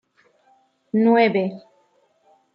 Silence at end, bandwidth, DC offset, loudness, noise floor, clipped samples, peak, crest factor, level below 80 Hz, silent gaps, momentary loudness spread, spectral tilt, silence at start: 0.95 s; 5.6 kHz; under 0.1%; -19 LUFS; -62 dBFS; under 0.1%; -4 dBFS; 20 dB; -76 dBFS; none; 14 LU; -9 dB/octave; 0.95 s